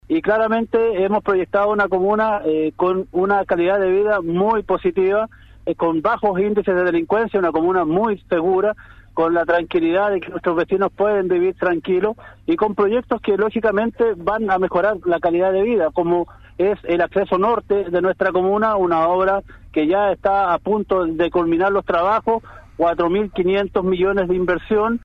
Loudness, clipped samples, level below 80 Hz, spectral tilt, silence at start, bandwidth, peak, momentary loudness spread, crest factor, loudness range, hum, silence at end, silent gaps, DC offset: -19 LUFS; under 0.1%; -46 dBFS; -8.5 dB/octave; 0.1 s; 5.2 kHz; -6 dBFS; 4 LU; 12 dB; 1 LU; none; 0.05 s; none; under 0.1%